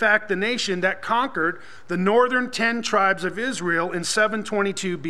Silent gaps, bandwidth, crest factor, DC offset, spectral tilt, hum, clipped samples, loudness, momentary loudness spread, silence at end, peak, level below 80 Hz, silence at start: none; 13.5 kHz; 18 dB; 1%; -3.5 dB/octave; none; under 0.1%; -22 LUFS; 6 LU; 0 s; -6 dBFS; -66 dBFS; 0 s